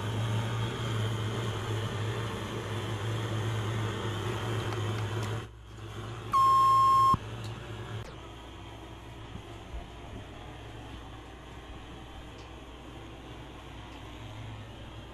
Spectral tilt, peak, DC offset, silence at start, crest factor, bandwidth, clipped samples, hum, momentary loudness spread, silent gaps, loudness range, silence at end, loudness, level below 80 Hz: -5.5 dB/octave; -16 dBFS; under 0.1%; 0 s; 16 dB; 14.5 kHz; under 0.1%; none; 21 LU; none; 18 LU; 0 s; -30 LUFS; -50 dBFS